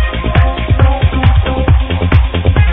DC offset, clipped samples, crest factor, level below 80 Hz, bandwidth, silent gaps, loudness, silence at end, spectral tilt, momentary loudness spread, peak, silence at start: under 0.1%; 0.5%; 10 dB; -14 dBFS; 4 kHz; none; -12 LUFS; 0 s; -10 dB/octave; 2 LU; 0 dBFS; 0 s